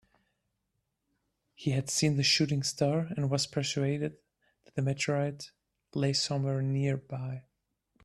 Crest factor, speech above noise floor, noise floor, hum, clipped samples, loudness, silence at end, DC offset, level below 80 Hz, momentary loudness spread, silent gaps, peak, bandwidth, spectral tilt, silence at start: 18 dB; 52 dB; -82 dBFS; none; under 0.1%; -31 LUFS; 0.65 s; under 0.1%; -66 dBFS; 13 LU; none; -14 dBFS; 12.5 kHz; -4.5 dB/octave; 1.6 s